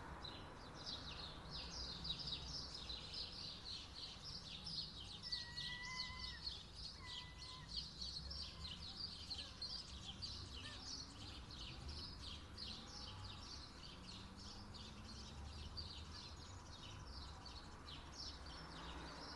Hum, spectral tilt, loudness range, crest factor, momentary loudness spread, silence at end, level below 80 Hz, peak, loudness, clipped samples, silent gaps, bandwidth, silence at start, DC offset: none; -3 dB/octave; 6 LU; 18 dB; 8 LU; 0 s; -60 dBFS; -34 dBFS; -50 LUFS; under 0.1%; none; 11.5 kHz; 0 s; under 0.1%